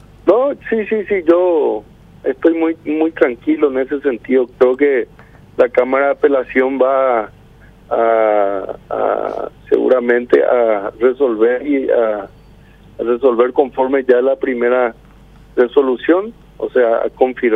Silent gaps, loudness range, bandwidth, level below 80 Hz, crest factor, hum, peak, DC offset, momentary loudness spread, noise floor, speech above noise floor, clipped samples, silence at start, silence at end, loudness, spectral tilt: none; 1 LU; 4.4 kHz; -50 dBFS; 14 dB; 50 Hz at -50 dBFS; 0 dBFS; under 0.1%; 9 LU; -43 dBFS; 28 dB; under 0.1%; 0.25 s; 0 s; -15 LUFS; -7.5 dB/octave